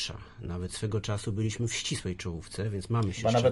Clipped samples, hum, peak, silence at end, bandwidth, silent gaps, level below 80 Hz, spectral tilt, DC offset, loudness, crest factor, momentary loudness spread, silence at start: under 0.1%; none; -12 dBFS; 0 s; 11.5 kHz; none; -50 dBFS; -5 dB/octave; under 0.1%; -32 LUFS; 20 dB; 10 LU; 0 s